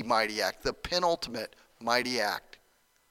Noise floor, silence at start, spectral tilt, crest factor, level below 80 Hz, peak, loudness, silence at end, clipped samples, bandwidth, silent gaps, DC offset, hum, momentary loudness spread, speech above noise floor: -68 dBFS; 0 s; -2.5 dB/octave; 22 dB; -56 dBFS; -10 dBFS; -30 LUFS; 0.7 s; under 0.1%; 17.5 kHz; none; under 0.1%; none; 11 LU; 37 dB